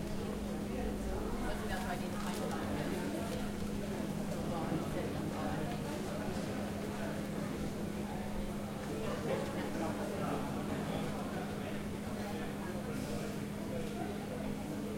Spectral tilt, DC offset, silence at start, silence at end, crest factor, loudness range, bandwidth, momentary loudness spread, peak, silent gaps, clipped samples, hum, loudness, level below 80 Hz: -6 dB/octave; under 0.1%; 0 s; 0 s; 14 dB; 2 LU; 16.5 kHz; 3 LU; -24 dBFS; none; under 0.1%; none; -39 LUFS; -50 dBFS